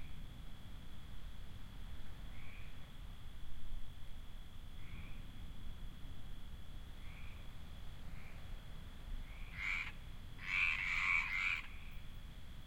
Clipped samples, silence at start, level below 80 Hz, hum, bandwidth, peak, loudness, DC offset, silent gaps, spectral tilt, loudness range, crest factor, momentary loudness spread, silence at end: under 0.1%; 0 s; -50 dBFS; none; 16 kHz; -22 dBFS; -40 LUFS; under 0.1%; none; -3.5 dB/octave; 17 LU; 20 dB; 21 LU; 0 s